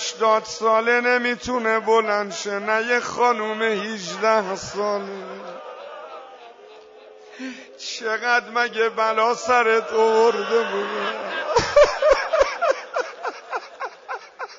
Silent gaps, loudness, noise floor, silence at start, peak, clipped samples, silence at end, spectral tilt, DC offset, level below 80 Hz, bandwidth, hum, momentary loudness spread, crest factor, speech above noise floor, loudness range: none; -21 LUFS; -45 dBFS; 0 s; -6 dBFS; under 0.1%; 0 s; -3 dB/octave; under 0.1%; -52 dBFS; 7.8 kHz; none; 17 LU; 16 dB; 25 dB; 9 LU